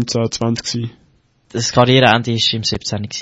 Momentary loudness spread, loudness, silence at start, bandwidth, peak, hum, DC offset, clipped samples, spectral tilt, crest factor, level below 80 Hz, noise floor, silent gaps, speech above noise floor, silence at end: 13 LU; -15 LUFS; 0 s; 8 kHz; 0 dBFS; none; under 0.1%; under 0.1%; -4.5 dB/octave; 16 dB; -46 dBFS; -56 dBFS; none; 40 dB; 0 s